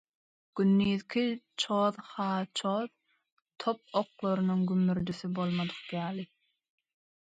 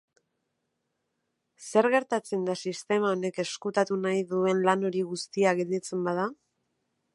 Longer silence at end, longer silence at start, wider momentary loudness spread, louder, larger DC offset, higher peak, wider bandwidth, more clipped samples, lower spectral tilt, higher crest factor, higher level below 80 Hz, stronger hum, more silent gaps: first, 1.05 s vs 0.8 s; second, 0.55 s vs 1.6 s; about the same, 9 LU vs 7 LU; second, -31 LUFS vs -28 LUFS; neither; second, -14 dBFS vs -8 dBFS; second, 9.2 kHz vs 11.5 kHz; neither; first, -6.5 dB/octave vs -5 dB/octave; about the same, 18 dB vs 22 dB; first, -66 dBFS vs -80 dBFS; neither; first, 3.32-3.37 s vs none